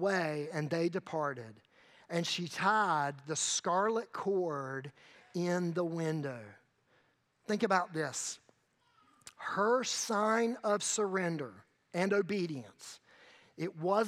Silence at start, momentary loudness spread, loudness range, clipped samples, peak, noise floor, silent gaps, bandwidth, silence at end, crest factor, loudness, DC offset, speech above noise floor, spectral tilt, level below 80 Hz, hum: 0 s; 14 LU; 4 LU; under 0.1%; -14 dBFS; -73 dBFS; none; 15.5 kHz; 0 s; 22 dB; -34 LUFS; under 0.1%; 39 dB; -4 dB/octave; -88 dBFS; none